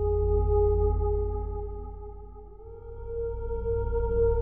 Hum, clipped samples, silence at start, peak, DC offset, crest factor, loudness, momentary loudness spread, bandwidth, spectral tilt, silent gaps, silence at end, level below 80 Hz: none; under 0.1%; 0 s; -14 dBFS; 0.3%; 14 dB; -29 LUFS; 21 LU; 1.5 kHz; -13 dB/octave; none; 0 s; -32 dBFS